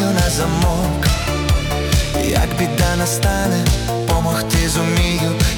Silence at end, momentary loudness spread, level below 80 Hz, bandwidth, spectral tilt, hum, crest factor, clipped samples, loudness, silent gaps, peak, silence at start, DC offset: 0 s; 2 LU; -22 dBFS; 18 kHz; -4.5 dB/octave; none; 14 dB; under 0.1%; -17 LUFS; none; -2 dBFS; 0 s; under 0.1%